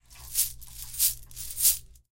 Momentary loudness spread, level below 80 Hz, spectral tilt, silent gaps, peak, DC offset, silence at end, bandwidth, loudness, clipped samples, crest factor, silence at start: 15 LU; -50 dBFS; 2 dB/octave; none; -6 dBFS; under 0.1%; 0.15 s; 17 kHz; -25 LUFS; under 0.1%; 24 dB; 0.1 s